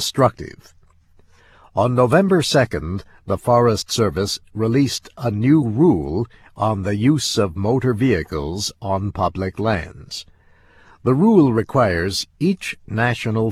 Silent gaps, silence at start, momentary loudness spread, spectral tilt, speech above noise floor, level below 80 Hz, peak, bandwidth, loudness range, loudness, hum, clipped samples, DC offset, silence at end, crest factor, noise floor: none; 0 s; 11 LU; -6 dB/octave; 33 dB; -44 dBFS; -2 dBFS; 15 kHz; 3 LU; -19 LUFS; none; under 0.1%; under 0.1%; 0 s; 18 dB; -52 dBFS